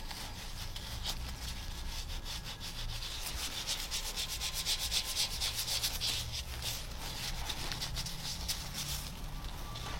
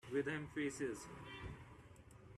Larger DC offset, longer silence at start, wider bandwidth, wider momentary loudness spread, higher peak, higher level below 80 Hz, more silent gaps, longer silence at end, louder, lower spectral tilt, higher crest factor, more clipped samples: neither; about the same, 0 s vs 0.05 s; first, 16.5 kHz vs 13 kHz; second, 10 LU vs 20 LU; first, -18 dBFS vs -28 dBFS; first, -44 dBFS vs -66 dBFS; neither; about the same, 0 s vs 0 s; first, -37 LUFS vs -45 LUFS; second, -1.5 dB/octave vs -5 dB/octave; about the same, 22 dB vs 18 dB; neither